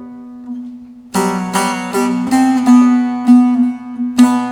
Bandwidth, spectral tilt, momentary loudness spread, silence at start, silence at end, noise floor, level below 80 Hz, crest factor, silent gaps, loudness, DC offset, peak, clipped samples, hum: 15.5 kHz; -5 dB/octave; 19 LU; 0 s; 0 s; -32 dBFS; -56 dBFS; 14 dB; none; -13 LUFS; under 0.1%; 0 dBFS; under 0.1%; none